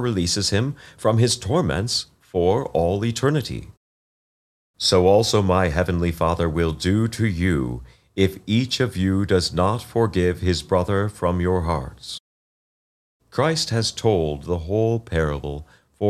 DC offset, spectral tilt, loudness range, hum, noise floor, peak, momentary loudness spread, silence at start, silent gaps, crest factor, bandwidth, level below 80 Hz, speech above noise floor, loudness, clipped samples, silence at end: under 0.1%; -5.5 dB/octave; 4 LU; none; under -90 dBFS; -4 dBFS; 10 LU; 0 s; 3.77-4.74 s, 12.20-13.20 s; 18 dB; 14.5 kHz; -40 dBFS; over 69 dB; -21 LUFS; under 0.1%; 0 s